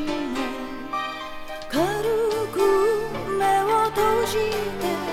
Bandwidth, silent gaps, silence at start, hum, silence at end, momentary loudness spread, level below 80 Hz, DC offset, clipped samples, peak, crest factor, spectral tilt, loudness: 16.5 kHz; none; 0 s; none; 0 s; 10 LU; -46 dBFS; under 0.1%; under 0.1%; -8 dBFS; 14 dB; -4.5 dB/octave; -23 LUFS